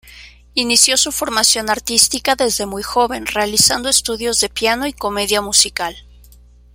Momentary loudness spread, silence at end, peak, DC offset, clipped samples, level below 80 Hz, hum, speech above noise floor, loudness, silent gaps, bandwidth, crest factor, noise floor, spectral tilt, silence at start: 9 LU; 0.75 s; 0 dBFS; under 0.1%; under 0.1%; -42 dBFS; 60 Hz at -40 dBFS; 28 dB; -14 LUFS; none; over 20 kHz; 18 dB; -44 dBFS; -0.5 dB/octave; 0.05 s